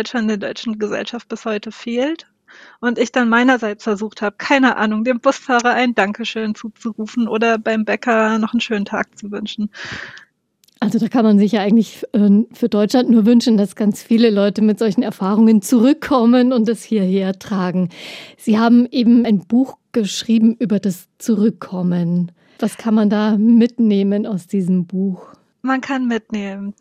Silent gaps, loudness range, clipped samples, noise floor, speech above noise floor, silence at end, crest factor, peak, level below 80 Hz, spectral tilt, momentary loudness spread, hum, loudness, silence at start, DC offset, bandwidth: none; 5 LU; under 0.1%; -59 dBFS; 43 dB; 0.1 s; 16 dB; 0 dBFS; -62 dBFS; -6 dB/octave; 12 LU; none; -17 LUFS; 0 s; under 0.1%; 14 kHz